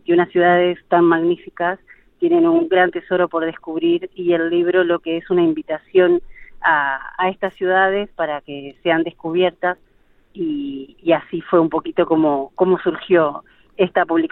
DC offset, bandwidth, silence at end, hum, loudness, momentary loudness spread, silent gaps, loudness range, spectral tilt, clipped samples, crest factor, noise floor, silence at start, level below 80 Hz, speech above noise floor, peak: under 0.1%; 4 kHz; 0.05 s; none; -18 LUFS; 9 LU; none; 3 LU; -9.5 dB/octave; under 0.1%; 16 dB; -53 dBFS; 0.1 s; -54 dBFS; 36 dB; -2 dBFS